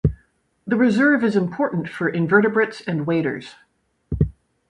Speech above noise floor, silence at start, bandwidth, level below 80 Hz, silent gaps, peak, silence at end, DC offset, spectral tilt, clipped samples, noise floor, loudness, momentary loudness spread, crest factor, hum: 42 dB; 0.05 s; 11.5 kHz; -38 dBFS; none; -4 dBFS; 0.4 s; under 0.1%; -8 dB/octave; under 0.1%; -61 dBFS; -20 LUFS; 10 LU; 18 dB; none